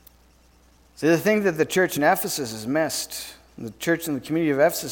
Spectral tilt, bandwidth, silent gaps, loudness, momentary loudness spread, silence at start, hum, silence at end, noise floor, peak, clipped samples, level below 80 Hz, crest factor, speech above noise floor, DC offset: -4 dB/octave; 19 kHz; none; -23 LUFS; 12 LU; 1 s; none; 0 s; -56 dBFS; -6 dBFS; under 0.1%; -58 dBFS; 18 dB; 33 dB; under 0.1%